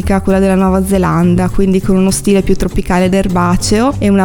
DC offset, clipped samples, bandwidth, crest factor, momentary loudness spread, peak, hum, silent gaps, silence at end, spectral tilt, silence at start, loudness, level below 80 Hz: under 0.1%; under 0.1%; 18.5 kHz; 10 dB; 2 LU; 0 dBFS; none; none; 0 s; -6 dB/octave; 0 s; -12 LUFS; -24 dBFS